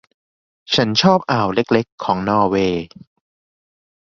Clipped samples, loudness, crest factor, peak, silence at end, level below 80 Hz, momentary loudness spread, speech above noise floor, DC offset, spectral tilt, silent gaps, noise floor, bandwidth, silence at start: under 0.1%; -17 LUFS; 18 dB; -2 dBFS; 1.25 s; -50 dBFS; 7 LU; over 73 dB; under 0.1%; -5.5 dB/octave; 1.92-1.98 s; under -90 dBFS; 7.4 kHz; 0.7 s